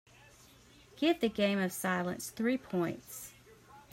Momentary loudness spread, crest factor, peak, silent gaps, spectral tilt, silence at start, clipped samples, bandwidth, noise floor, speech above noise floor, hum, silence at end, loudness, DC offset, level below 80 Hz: 14 LU; 18 dB; -18 dBFS; none; -5 dB/octave; 0.95 s; under 0.1%; 16 kHz; -60 dBFS; 27 dB; none; 0.1 s; -33 LUFS; under 0.1%; -68 dBFS